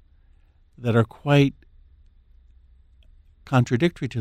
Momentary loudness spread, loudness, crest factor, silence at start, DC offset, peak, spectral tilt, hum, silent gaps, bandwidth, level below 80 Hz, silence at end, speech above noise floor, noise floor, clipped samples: 5 LU; -22 LUFS; 20 dB; 0.8 s; under 0.1%; -6 dBFS; -7.5 dB/octave; none; none; 11.5 kHz; -52 dBFS; 0 s; 35 dB; -56 dBFS; under 0.1%